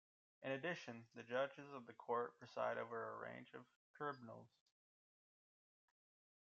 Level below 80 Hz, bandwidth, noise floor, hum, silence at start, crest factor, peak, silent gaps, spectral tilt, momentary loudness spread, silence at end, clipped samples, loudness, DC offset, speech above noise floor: under -90 dBFS; 7.6 kHz; under -90 dBFS; none; 0.4 s; 20 dB; -30 dBFS; 3.76-3.94 s; -3.5 dB/octave; 13 LU; 2 s; under 0.1%; -48 LUFS; under 0.1%; over 41 dB